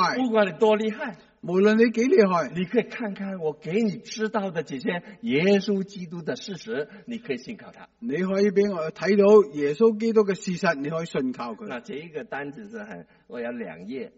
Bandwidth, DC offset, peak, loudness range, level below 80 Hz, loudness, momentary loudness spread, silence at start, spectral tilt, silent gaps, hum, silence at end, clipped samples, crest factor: 8 kHz; under 0.1%; -6 dBFS; 6 LU; -68 dBFS; -24 LUFS; 16 LU; 0 s; -5 dB/octave; none; none; 0.1 s; under 0.1%; 20 dB